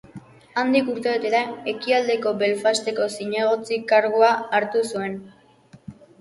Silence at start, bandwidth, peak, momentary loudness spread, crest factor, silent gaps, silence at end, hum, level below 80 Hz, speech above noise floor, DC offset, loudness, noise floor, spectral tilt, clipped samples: 0.15 s; 11.5 kHz; -4 dBFS; 9 LU; 18 dB; none; 0.3 s; none; -68 dBFS; 30 dB; under 0.1%; -22 LUFS; -51 dBFS; -4 dB/octave; under 0.1%